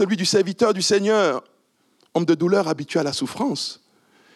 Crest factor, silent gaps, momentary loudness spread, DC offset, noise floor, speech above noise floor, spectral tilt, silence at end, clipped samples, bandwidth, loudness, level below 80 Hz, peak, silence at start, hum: 16 dB; none; 9 LU; under 0.1%; -63 dBFS; 43 dB; -4.5 dB/octave; 0.6 s; under 0.1%; 13 kHz; -21 LUFS; -68 dBFS; -6 dBFS; 0 s; none